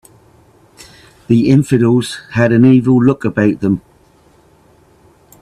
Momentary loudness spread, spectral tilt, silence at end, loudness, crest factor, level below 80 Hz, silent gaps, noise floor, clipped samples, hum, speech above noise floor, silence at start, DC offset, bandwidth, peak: 8 LU; -7.5 dB/octave; 1.6 s; -12 LUFS; 14 dB; -48 dBFS; none; -49 dBFS; under 0.1%; none; 38 dB; 1.3 s; under 0.1%; 12.5 kHz; 0 dBFS